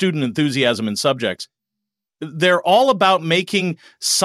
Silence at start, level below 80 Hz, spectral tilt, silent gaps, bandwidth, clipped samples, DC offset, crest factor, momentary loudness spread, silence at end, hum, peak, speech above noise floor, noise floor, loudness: 0 s; -66 dBFS; -3.5 dB/octave; none; 16 kHz; under 0.1%; under 0.1%; 16 dB; 15 LU; 0 s; none; -4 dBFS; 65 dB; -83 dBFS; -17 LUFS